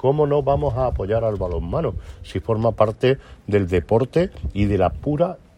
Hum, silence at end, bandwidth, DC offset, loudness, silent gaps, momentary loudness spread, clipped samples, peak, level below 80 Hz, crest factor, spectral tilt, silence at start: none; 0.2 s; 11 kHz; under 0.1%; -21 LUFS; none; 7 LU; under 0.1%; -2 dBFS; -34 dBFS; 18 dB; -8.5 dB/octave; 0.05 s